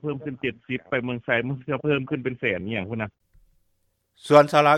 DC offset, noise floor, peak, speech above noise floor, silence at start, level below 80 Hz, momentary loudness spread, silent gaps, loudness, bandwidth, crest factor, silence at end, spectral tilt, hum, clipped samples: under 0.1%; -70 dBFS; -4 dBFS; 48 dB; 0.05 s; -60 dBFS; 14 LU; none; -24 LUFS; 13.5 kHz; 20 dB; 0 s; -6.5 dB/octave; none; under 0.1%